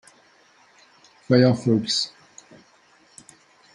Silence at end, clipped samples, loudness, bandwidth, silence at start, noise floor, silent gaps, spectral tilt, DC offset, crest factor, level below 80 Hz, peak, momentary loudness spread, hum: 1.65 s; under 0.1%; -21 LUFS; 11 kHz; 1.3 s; -57 dBFS; none; -5.5 dB/octave; under 0.1%; 22 dB; -68 dBFS; -4 dBFS; 7 LU; none